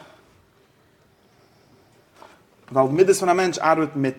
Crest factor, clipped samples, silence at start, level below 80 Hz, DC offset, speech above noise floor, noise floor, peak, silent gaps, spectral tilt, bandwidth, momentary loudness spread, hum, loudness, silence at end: 20 dB; under 0.1%; 2.7 s; -66 dBFS; under 0.1%; 39 dB; -58 dBFS; -4 dBFS; none; -5 dB/octave; 16 kHz; 5 LU; none; -19 LUFS; 0 s